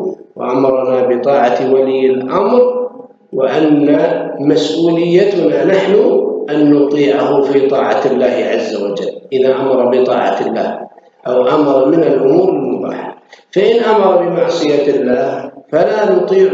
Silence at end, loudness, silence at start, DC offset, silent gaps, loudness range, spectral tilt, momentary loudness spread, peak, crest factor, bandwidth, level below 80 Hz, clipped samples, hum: 0 s; -12 LUFS; 0 s; under 0.1%; none; 2 LU; -6.5 dB/octave; 9 LU; 0 dBFS; 12 dB; 7.8 kHz; -60 dBFS; under 0.1%; none